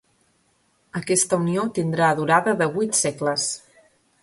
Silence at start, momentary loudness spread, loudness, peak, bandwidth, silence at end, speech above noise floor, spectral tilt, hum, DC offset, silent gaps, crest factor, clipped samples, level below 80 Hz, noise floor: 0.95 s; 9 LU; -21 LUFS; -4 dBFS; 12 kHz; 0.65 s; 43 dB; -4 dB/octave; none; under 0.1%; none; 20 dB; under 0.1%; -64 dBFS; -65 dBFS